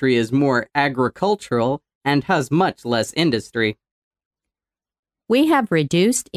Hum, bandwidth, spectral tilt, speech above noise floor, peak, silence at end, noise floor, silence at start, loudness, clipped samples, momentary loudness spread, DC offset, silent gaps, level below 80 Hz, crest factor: none; 15.5 kHz; -5 dB/octave; over 71 dB; -4 dBFS; 0 s; under -90 dBFS; 0 s; -19 LUFS; under 0.1%; 6 LU; under 0.1%; 1.95-2.01 s, 3.91-4.11 s, 4.26-4.31 s, 4.99-5.03 s; -56 dBFS; 16 dB